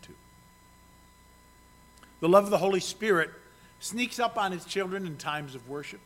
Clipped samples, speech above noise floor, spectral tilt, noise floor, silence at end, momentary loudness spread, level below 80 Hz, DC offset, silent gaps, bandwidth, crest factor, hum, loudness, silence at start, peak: under 0.1%; 29 dB; -4.5 dB/octave; -57 dBFS; 0.05 s; 15 LU; -64 dBFS; under 0.1%; none; 16.5 kHz; 24 dB; 60 Hz at -60 dBFS; -28 LUFS; 0.05 s; -6 dBFS